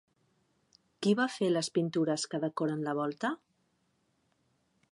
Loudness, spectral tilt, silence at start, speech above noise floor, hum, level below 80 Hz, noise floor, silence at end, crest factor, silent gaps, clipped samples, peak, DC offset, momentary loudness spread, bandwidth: -32 LUFS; -5 dB/octave; 1 s; 44 dB; none; -82 dBFS; -75 dBFS; 1.55 s; 18 dB; none; under 0.1%; -16 dBFS; under 0.1%; 6 LU; 11.5 kHz